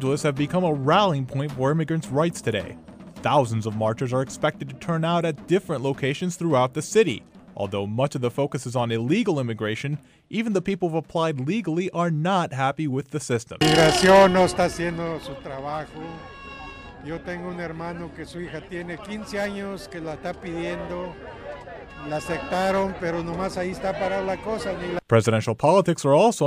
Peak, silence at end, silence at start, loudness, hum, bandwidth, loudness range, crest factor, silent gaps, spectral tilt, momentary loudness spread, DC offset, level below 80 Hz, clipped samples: -6 dBFS; 0 s; 0 s; -24 LUFS; none; 15.5 kHz; 12 LU; 18 dB; none; -5.5 dB/octave; 15 LU; under 0.1%; -50 dBFS; under 0.1%